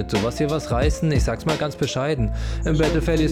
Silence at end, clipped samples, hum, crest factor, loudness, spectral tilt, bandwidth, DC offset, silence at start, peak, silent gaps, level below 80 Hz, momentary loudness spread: 0 s; under 0.1%; none; 12 dB; -22 LUFS; -6 dB/octave; 15 kHz; under 0.1%; 0 s; -8 dBFS; none; -28 dBFS; 4 LU